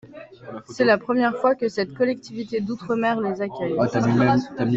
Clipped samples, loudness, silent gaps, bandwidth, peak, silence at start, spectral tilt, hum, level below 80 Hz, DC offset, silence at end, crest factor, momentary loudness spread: under 0.1%; -22 LUFS; none; 7.8 kHz; -4 dBFS; 0.05 s; -7 dB/octave; none; -58 dBFS; under 0.1%; 0 s; 18 dB; 11 LU